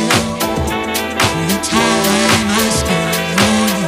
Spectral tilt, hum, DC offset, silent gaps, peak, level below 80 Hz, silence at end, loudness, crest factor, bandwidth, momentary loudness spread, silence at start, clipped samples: -3.5 dB/octave; none; under 0.1%; none; 0 dBFS; -34 dBFS; 0 s; -14 LUFS; 14 dB; 16 kHz; 5 LU; 0 s; under 0.1%